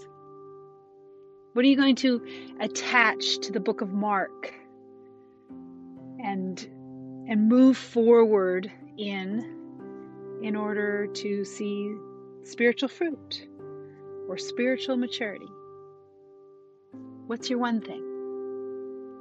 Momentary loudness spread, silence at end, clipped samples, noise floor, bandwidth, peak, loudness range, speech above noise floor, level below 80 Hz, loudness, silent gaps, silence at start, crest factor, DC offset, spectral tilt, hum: 24 LU; 0 s; under 0.1%; -54 dBFS; 8.2 kHz; -6 dBFS; 10 LU; 29 dB; -80 dBFS; -26 LUFS; none; 0 s; 22 dB; under 0.1%; -4.5 dB/octave; none